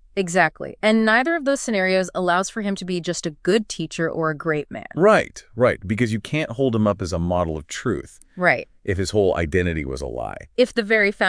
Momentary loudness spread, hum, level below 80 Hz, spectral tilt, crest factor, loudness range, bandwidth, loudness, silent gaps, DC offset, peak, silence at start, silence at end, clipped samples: 10 LU; none; -44 dBFS; -5 dB/octave; 18 dB; 2 LU; 10.5 kHz; -21 LUFS; none; under 0.1%; -2 dBFS; 0.15 s; 0 s; under 0.1%